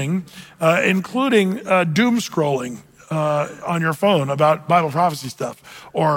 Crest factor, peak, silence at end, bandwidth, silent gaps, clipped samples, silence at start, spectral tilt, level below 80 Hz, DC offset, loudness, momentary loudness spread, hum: 16 dB; -4 dBFS; 0 s; 17 kHz; none; under 0.1%; 0 s; -5.5 dB/octave; -62 dBFS; under 0.1%; -19 LUFS; 12 LU; none